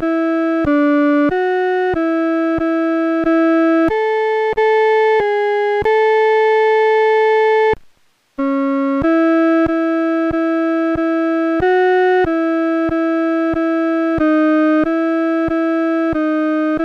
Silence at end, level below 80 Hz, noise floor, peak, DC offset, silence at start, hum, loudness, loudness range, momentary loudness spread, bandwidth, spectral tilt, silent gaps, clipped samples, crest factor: 0 s; -44 dBFS; -54 dBFS; -6 dBFS; under 0.1%; 0 s; none; -15 LUFS; 2 LU; 4 LU; 6.4 kHz; -7 dB/octave; none; under 0.1%; 8 dB